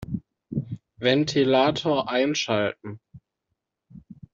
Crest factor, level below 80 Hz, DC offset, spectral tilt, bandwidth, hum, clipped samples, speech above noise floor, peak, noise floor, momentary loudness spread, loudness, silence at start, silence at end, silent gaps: 20 dB; -58 dBFS; under 0.1%; -5 dB/octave; 7.8 kHz; none; under 0.1%; 58 dB; -4 dBFS; -81 dBFS; 18 LU; -24 LUFS; 0 s; 0.2 s; none